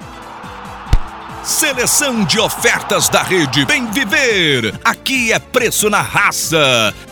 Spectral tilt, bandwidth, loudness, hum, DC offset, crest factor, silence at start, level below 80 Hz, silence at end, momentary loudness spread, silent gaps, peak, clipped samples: -2.5 dB/octave; over 20 kHz; -13 LUFS; none; under 0.1%; 14 dB; 0 s; -28 dBFS; 0 s; 15 LU; none; 0 dBFS; under 0.1%